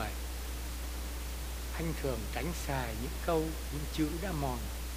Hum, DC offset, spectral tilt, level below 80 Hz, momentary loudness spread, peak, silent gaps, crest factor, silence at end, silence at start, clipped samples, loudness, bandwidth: none; under 0.1%; -5 dB/octave; -40 dBFS; 7 LU; -18 dBFS; none; 18 dB; 0 s; 0 s; under 0.1%; -37 LUFS; 15.5 kHz